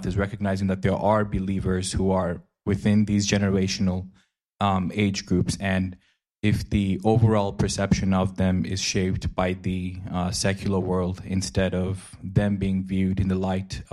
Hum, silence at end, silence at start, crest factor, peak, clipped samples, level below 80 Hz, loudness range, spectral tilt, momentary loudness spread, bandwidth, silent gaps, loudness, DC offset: none; 0.1 s; 0 s; 16 dB; -8 dBFS; under 0.1%; -42 dBFS; 3 LU; -6 dB/octave; 7 LU; 12 kHz; none; -25 LUFS; under 0.1%